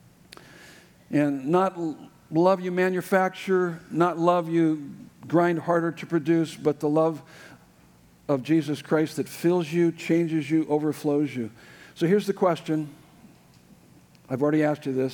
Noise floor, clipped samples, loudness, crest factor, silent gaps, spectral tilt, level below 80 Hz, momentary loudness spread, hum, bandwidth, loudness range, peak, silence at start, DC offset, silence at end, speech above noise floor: -56 dBFS; under 0.1%; -25 LUFS; 18 dB; none; -7 dB/octave; -70 dBFS; 8 LU; none; 19 kHz; 3 LU; -8 dBFS; 0.65 s; under 0.1%; 0 s; 32 dB